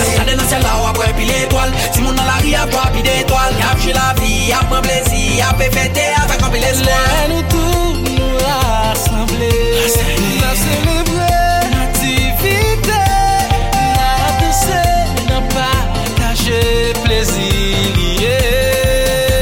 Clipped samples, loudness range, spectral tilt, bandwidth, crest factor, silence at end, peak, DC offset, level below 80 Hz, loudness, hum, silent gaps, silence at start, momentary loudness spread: under 0.1%; 1 LU; -4 dB/octave; 17 kHz; 12 dB; 0 s; -2 dBFS; under 0.1%; -18 dBFS; -13 LUFS; none; none; 0 s; 2 LU